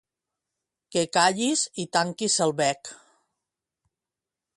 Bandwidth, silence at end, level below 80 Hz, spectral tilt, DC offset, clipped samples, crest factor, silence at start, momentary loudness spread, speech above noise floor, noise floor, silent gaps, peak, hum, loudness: 11.5 kHz; 1.6 s; -72 dBFS; -2.5 dB/octave; under 0.1%; under 0.1%; 22 dB; 0.9 s; 9 LU; 64 dB; -89 dBFS; none; -6 dBFS; none; -24 LUFS